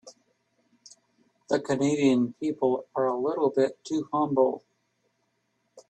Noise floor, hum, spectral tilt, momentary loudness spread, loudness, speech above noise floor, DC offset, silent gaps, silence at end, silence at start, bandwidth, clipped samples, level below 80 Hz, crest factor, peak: -74 dBFS; none; -6 dB/octave; 6 LU; -26 LUFS; 49 dB; under 0.1%; none; 0.1 s; 0.05 s; 9 kHz; under 0.1%; -72 dBFS; 18 dB; -10 dBFS